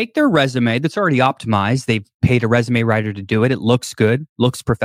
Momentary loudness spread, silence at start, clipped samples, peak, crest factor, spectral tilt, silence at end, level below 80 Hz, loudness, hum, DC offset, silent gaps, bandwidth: 4 LU; 0 s; under 0.1%; -2 dBFS; 14 dB; -6.5 dB/octave; 0 s; -46 dBFS; -17 LUFS; none; under 0.1%; 2.14-2.20 s, 4.29-4.36 s; 15 kHz